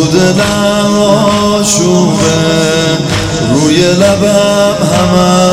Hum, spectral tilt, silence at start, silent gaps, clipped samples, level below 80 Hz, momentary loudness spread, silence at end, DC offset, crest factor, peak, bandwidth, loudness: none; -4.5 dB/octave; 0 s; none; 0.4%; -34 dBFS; 3 LU; 0 s; under 0.1%; 8 dB; 0 dBFS; 16 kHz; -9 LUFS